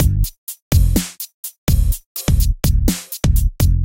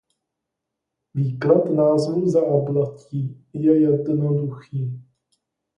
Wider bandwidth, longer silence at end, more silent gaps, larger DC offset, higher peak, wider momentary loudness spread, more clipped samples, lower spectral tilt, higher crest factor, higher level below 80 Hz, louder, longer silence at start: first, 17.5 kHz vs 10.5 kHz; second, 0 s vs 0.75 s; first, 0.38-0.47 s, 0.62-0.71 s, 1.34-1.43 s, 1.58-1.67 s, 2.06-2.15 s vs none; first, 0.6% vs under 0.1%; about the same, -2 dBFS vs -4 dBFS; about the same, 10 LU vs 11 LU; neither; second, -5.5 dB/octave vs -9.5 dB/octave; about the same, 14 dB vs 18 dB; first, -18 dBFS vs -64 dBFS; about the same, -19 LUFS vs -21 LUFS; second, 0 s vs 1.15 s